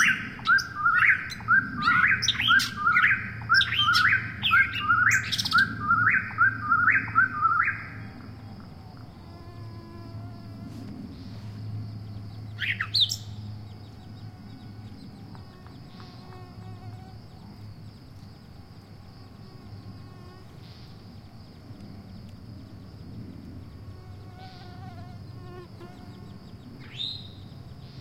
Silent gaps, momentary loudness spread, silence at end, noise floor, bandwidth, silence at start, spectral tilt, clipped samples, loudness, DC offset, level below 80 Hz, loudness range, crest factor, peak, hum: none; 25 LU; 0 s; -46 dBFS; 16.5 kHz; 0 s; -2.5 dB/octave; under 0.1%; -22 LUFS; under 0.1%; -56 dBFS; 24 LU; 20 dB; -8 dBFS; none